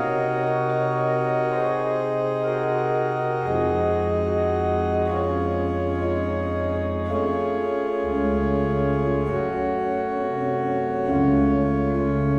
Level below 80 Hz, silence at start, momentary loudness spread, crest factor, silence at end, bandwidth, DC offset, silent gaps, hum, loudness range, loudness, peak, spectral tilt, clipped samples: -38 dBFS; 0 s; 3 LU; 12 dB; 0 s; 8 kHz; under 0.1%; none; none; 1 LU; -23 LUFS; -10 dBFS; -9.5 dB/octave; under 0.1%